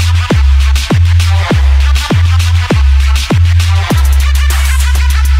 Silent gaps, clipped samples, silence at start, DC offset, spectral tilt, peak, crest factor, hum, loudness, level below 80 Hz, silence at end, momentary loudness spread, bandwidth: none; under 0.1%; 0 s; under 0.1%; -5 dB/octave; 0 dBFS; 8 dB; none; -10 LUFS; -10 dBFS; 0 s; 2 LU; 15.5 kHz